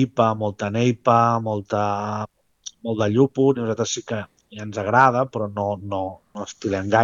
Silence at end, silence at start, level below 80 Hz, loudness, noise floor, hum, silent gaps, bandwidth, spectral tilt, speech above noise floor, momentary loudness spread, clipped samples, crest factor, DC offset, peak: 0 s; 0 s; -64 dBFS; -22 LUFS; -43 dBFS; none; none; 7.6 kHz; -6 dB/octave; 22 dB; 16 LU; under 0.1%; 20 dB; under 0.1%; -2 dBFS